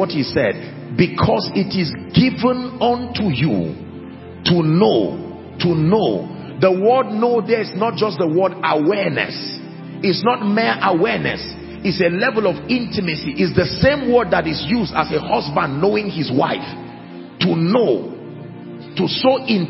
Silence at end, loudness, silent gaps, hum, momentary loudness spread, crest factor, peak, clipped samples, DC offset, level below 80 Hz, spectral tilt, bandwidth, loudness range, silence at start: 0 s; -18 LUFS; none; none; 15 LU; 18 dB; 0 dBFS; under 0.1%; under 0.1%; -44 dBFS; -10 dB/octave; 5.8 kHz; 2 LU; 0 s